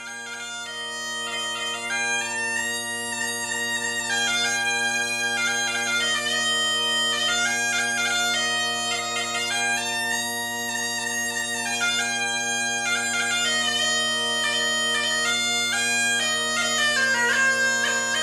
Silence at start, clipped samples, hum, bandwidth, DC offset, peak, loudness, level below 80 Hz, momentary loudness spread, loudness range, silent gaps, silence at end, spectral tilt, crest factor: 0 s; under 0.1%; none; 14 kHz; under 0.1%; -10 dBFS; -22 LUFS; -62 dBFS; 6 LU; 4 LU; none; 0 s; 0.5 dB/octave; 14 dB